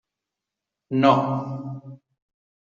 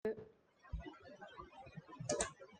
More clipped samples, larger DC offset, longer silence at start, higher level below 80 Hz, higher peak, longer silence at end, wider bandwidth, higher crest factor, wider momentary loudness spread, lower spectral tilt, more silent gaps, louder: neither; neither; first, 0.9 s vs 0.05 s; second, -66 dBFS vs -58 dBFS; first, -4 dBFS vs -22 dBFS; first, 0.7 s vs 0 s; second, 7.2 kHz vs 10 kHz; about the same, 22 dB vs 26 dB; about the same, 18 LU vs 16 LU; first, -6 dB/octave vs -3.5 dB/octave; neither; first, -22 LUFS vs -47 LUFS